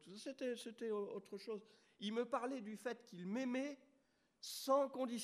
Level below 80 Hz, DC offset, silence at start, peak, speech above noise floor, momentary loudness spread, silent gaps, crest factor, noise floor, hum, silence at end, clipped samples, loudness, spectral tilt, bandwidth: under -90 dBFS; under 0.1%; 0 s; -24 dBFS; 35 dB; 13 LU; none; 20 dB; -79 dBFS; none; 0 s; under 0.1%; -44 LUFS; -4.5 dB/octave; 15 kHz